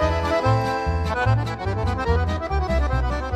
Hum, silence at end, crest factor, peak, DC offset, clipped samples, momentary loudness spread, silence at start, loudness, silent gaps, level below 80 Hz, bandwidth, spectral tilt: none; 0 s; 14 dB; -8 dBFS; under 0.1%; under 0.1%; 4 LU; 0 s; -23 LUFS; none; -28 dBFS; 9.8 kHz; -7 dB/octave